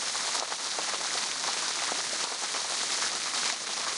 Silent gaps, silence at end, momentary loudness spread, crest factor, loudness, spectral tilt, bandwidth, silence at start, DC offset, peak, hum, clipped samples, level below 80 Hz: none; 0 s; 2 LU; 20 dB; -29 LUFS; 1.5 dB/octave; 11.5 kHz; 0 s; under 0.1%; -12 dBFS; none; under 0.1%; -76 dBFS